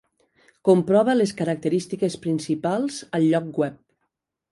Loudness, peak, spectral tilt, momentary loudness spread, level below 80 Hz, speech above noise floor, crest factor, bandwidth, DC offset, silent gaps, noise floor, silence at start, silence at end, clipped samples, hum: -23 LUFS; -4 dBFS; -6.5 dB/octave; 9 LU; -66 dBFS; 56 dB; 18 dB; 11.5 kHz; under 0.1%; none; -77 dBFS; 0.65 s; 0.75 s; under 0.1%; none